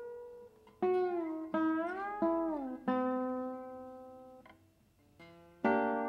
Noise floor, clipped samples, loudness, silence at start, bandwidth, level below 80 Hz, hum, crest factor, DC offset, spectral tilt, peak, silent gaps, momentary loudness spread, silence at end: -68 dBFS; under 0.1%; -35 LUFS; 0 s; 6 kHz; -74 dBFS; none; 18 dB; under 0.1%; -8 dB/octave; -18 dBFS; none; 20 LU; 0 s